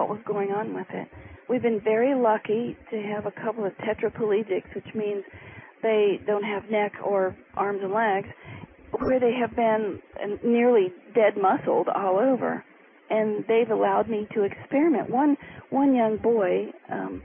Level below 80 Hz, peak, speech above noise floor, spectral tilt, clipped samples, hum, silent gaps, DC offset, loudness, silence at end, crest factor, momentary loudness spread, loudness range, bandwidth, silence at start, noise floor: -60 dBFS; -10 dBFS; 19 dB; -10.5 dB/octave; under 0.1%; none; none; under 0.1%; -25 LUFS; 0 s; 14 dB; 12 LU; 4 LU; 3.6 kHz; 0 s; -43 dBFS